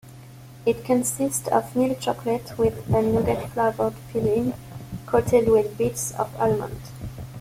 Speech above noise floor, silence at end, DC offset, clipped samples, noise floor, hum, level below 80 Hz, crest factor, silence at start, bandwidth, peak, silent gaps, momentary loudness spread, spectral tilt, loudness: 21 dB; 0 s; under 0.1%; under 0.1%; -43 dBFS; none; -48 dBFS; 18 dB; 0.05 s; 16.5 kHz; -6 dBFS; none; 15 LU; -5.5 dB/octave; -23 LUFS